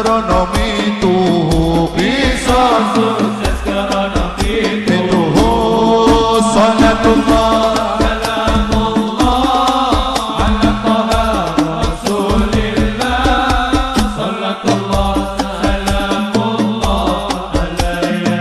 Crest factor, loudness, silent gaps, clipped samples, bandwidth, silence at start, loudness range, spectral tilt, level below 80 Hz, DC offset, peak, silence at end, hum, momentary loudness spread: 12 dB; -14 LUFS; none; under 0.1%; 14 kHz; 0 s; 4 LU; -5.5 dB/octave; -22 dBFS; under 0.1%; -2 dBFS; 0 s; none; 6 LU